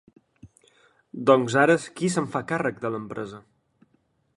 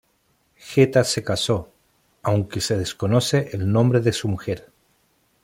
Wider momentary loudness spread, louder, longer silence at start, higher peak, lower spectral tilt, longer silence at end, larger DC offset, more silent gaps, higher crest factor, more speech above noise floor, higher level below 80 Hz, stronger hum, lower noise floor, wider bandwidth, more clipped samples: first, 16 LU vs 9 LU; about the same, -24 LUFS vs -22 LUFS; second, 0.45 s vs 0.65 s; about the same, -4 dBFS vs -2 dBFS; about the same, -5.5 dB/octave vs -5.5 dB/octave; first, 1 s vs 0.85 s; neither; neither; about the same, 22 dB vs 20 dB; about the same, 45 dB vs 45 dB; second, -66 dBFS vs -54 dBFS; neither; about the same, -68 dBFS vs -65 dBFS; second, 11.5 kHz vs 16.5 kHz; neither